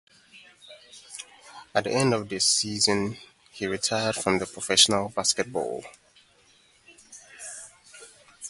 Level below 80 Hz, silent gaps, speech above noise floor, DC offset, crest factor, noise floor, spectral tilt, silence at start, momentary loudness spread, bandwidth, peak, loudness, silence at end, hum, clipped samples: -62 dBFS; none; 35 dB; under 0.1%; 26 dB; -60 dBFS; -2.5 dB/octave; 0.35 s; 24 LU; 12 kHz; -2 dBFS; -24 LUFS; 0 s; none; under 0.1%